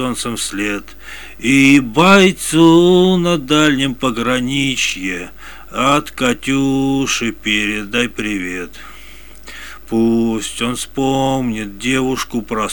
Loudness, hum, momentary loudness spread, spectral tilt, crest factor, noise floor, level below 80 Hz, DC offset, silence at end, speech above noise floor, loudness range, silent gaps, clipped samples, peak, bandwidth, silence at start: -15 LUFS; none; 17 LU; -4.5 dB/octave; 16 dB; -38 dBFS; -42 dBFS; 1%; 0 s; 23 dB; 8 LU; none; under 0.1%; 0 dBFS; 18.5 kHz; 0 s